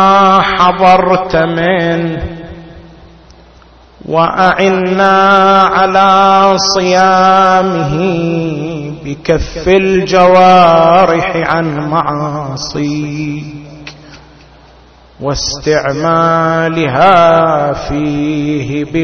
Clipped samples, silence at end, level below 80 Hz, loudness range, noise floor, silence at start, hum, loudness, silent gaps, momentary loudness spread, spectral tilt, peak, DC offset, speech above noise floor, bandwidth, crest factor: 0.3%; 0 s; -34 dBFS; 10 LU; -40 dBFS; 0 s; none; -10 LUFS; none; 13 LU; -5.5 dB/octave; 0 dBFS; under 0.1%; 31 dB; 7 kHz; 10 dB